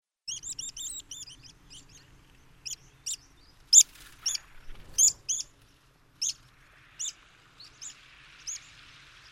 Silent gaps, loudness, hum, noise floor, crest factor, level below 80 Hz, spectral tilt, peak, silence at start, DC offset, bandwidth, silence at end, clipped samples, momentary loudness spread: none; -26 LUFS; none; -61 dBFS; 28 dB; -58 dBFS; 2.5 dB/octave; -4 dBFS; 0.25 s; under 0.1%; 16 kHz; 0.75 s; under 0.1%; 25 LU